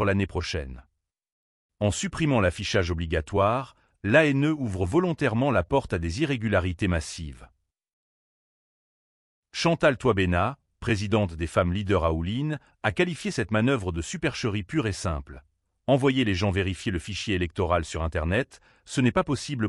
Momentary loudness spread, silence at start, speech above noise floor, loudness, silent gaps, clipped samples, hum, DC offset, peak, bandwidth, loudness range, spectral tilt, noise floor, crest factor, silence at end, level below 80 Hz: 9 LU; 0 s; over 65 dB; -26 LUFS; 1.32-1.69 s, 7.93-9.43 s; under 0.1%; none; under 0.1%; -6 dBFS; 12 kHz; 5 LU; -6 dB/octave; under -90 dBFS; 20 dB; 0 s; -42 dBFS